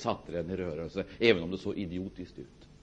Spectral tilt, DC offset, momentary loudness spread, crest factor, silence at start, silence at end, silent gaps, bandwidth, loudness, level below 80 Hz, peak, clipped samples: -6 dB/octave; under 0.1%; 19 LU; 24 dB; 0 s; 0.1 s; none; 8.4 kHz; -32 LUFS; -56 dBFS; -8 dBFS; under 0.1%